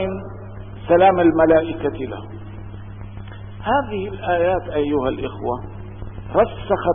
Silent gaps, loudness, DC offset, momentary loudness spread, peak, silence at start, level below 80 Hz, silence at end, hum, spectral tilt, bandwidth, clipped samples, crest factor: none; -19 LUFS; 0.2%; 21 LU; -4 dBFS; 0 s; -40 dBFS; 0 s; none; -11.5 dB/octave; 3.7 kHz; under 0.1%; 16 dB